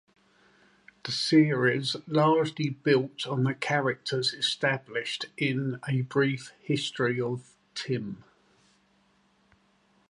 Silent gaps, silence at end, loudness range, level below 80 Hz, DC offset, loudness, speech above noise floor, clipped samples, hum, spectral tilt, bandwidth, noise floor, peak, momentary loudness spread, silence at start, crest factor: none; 1.95 s; 8 LU; -74 dBFS; under 0.1%; -28 LUFS; 39 dB; under 0.1%; none; -5.5 dB/octave; 11.5 kHz; -66 dBFS; -10 dBFS; 10 LU; 1.05 s; 20 dB